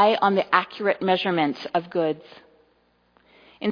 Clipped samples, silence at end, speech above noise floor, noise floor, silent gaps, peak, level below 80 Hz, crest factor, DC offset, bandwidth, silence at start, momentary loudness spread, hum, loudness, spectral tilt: under 0.1%; 0 s; 42 dB; -64 dBFS; none; -2 dBFS; -72 dBFS; 22 dB; under 0.1%; 5.2 kHz; 0 s; 8 LU; 60 Hz at -55 dBFS; -23 LUFS; -7 dB/octave